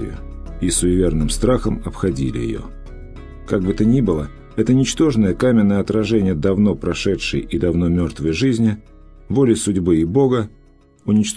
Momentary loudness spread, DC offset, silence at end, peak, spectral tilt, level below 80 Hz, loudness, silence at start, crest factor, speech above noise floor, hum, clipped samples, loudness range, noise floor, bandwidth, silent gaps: 15 LU; under 0.1%; 0 s; -2 dBFS; -6 dB/octave; -32 dBFS; -18 LUFS; 0 s; 16 dB; 31 dB; none; under 0.1%; 4 LU; -48 dBFS; 11 kHz; none